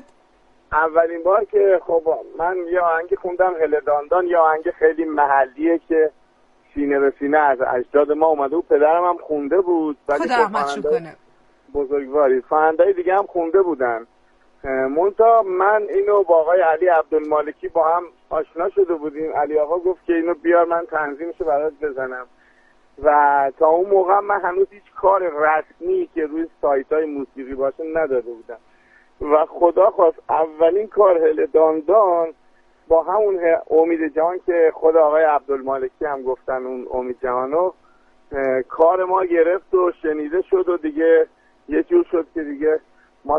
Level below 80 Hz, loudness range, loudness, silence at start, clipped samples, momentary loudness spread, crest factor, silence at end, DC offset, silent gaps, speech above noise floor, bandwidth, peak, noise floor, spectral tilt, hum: -52 dBFS; 4 LU; -18 LUFS; 0.7 s; under 0.1%; 9 LU; 16 dB; 0 s; under 0.1%; none; 38 dB; 7.8 kHz; -2 dBFS; -56 dBFS; -6.5 dB/octave; none